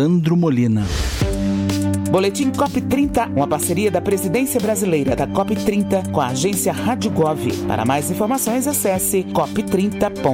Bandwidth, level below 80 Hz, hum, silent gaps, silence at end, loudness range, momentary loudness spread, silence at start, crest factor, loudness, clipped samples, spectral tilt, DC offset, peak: 17 kHz; -34 dBFS; none; none; 0 s; 1 LU; 3 LU; 0 s; 16 dB; -19 LUFS; under 0.1%; -5.5 dB/octave; under 0.1%; -2 dBFS